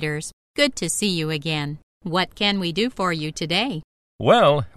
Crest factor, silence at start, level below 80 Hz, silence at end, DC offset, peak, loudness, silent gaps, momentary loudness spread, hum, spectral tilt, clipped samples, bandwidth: 20 dB; 0 s; -52 dBFS; 0.1 s; under 0.1%; -2 dBFS; -22 LUFS; 0.33-0.54 s, 1.83-2.00 s, 3.84-4.19 s; 14 LU; none; -4 dB/octave; under 0.1%; 14 kHz